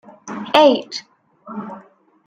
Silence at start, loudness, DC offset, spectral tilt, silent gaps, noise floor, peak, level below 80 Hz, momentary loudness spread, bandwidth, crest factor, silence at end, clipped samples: 0.25 s; -15 LUFS; under 0.1%; -4 dB/octave; none; -47 dBFS; 0 dBFS; -66 dBFS; 21 LU; 13.5 kHz; 20 dB; 0.45 s; under 0.1%